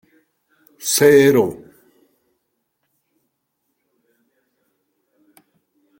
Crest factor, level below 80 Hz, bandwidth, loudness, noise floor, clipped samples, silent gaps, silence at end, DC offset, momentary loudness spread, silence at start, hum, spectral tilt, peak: 20 dB; -62 dBFS; 16.5 kHz; -14 LUFS; -73 dBFS; under 0.1%; none; 4.45 s; under 0.1%; 16 LU; 0.85 s; none; -4 dB/octave; -2 dBFS